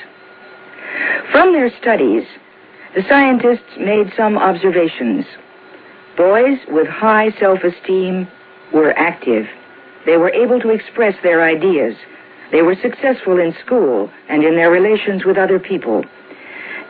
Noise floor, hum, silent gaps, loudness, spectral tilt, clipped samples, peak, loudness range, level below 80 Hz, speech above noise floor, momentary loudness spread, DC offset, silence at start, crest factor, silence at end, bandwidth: -40 dBFS; none; none; -14 LUFS; -9.5 dB/octave; under 0.1%; 0 dBFS; 2 LU; -60 dBFS; 27 dB; 12 LU; under 0.1%; 0 s; 14 dB; 0 s; 4.9 kHz